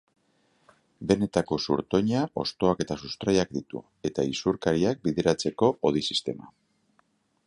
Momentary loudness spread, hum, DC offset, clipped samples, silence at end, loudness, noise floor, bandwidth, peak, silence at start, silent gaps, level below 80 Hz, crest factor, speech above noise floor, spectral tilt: 9 LU; none; under 0.1%; under 0.1%; 1 s; -27 LUFS; -69 dBFS; 11.5 kHz; -6 dBFS; 1 s; none; -54 dBFS; 22 dB; 42 dB; -5.5 dB/octave